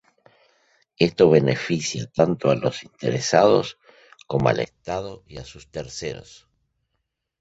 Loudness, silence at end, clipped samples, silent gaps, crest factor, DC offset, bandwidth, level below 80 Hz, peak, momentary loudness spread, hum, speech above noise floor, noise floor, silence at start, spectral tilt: -21 LUFS; 1.2 s; under 0.1%; none; 22 dB; under 0.1%; 8 kHz; -54 dBFS; -2 dBFS; 19 LU; none; 56 dB; -77 dBFS; 1 s; -5.5 dB/octave